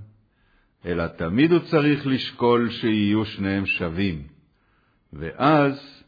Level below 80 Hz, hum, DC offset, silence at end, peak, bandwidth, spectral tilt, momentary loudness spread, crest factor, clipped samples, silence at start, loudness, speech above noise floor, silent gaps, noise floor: -50 dBFS; none; under 0.1%; 0.15 s; -6 dBFS; 5 kHz; -8.5 dB/octave; 10 LU; 18 dB; under 0.1%; 0 s; -22 LUFS; 42 dB; none; -64 dBFS